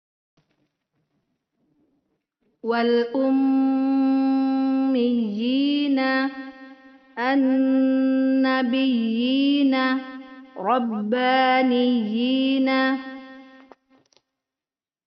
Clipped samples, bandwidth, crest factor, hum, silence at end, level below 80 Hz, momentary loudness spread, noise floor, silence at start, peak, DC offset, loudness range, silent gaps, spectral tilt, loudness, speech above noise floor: under 0.1%; 5.6 kHz; 16 dB; none; 1.65 s; -72 dBFS; 10 LU; under -90 dBFS; 2.65 s; -8 dBFS; under 0.1%; 4 LU; none; -2.5 dB/octave; -21 LUFS; over 70 dB